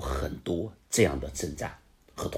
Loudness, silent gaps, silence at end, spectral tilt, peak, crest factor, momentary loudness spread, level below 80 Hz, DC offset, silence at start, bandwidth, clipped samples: -31 LUFS; none; 0 s; -4.5 dB/octave; -10 dBFS; 22 dB; 13 LU; -42 dBFS; under 0.1%; 0 s; 16 kHz; under 0.1%